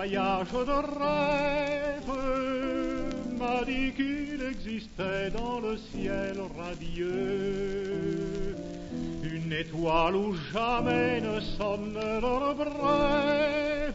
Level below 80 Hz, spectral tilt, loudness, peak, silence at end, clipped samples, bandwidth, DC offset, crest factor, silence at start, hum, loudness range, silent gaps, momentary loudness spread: -42 dBFS; -6 dB/octave; -30 LUFS; -12 dBFS; 0 s; under 0.1%; 8 kHz; under 0.1%; 16 dB; 0 s; none; 5 LU; none; 9 LU